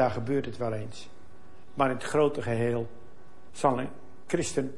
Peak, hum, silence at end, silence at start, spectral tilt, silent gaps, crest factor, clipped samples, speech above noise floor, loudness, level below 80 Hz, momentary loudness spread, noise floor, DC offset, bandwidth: -8 dBFS; none; 0 s; 0 s; -6 dB/octave; none; 22 dB; under 0.1%; 26 dB; -29 LUFS; -62 dBFS; 17 LU; -55 dBFS; 1%; 11.5 kHz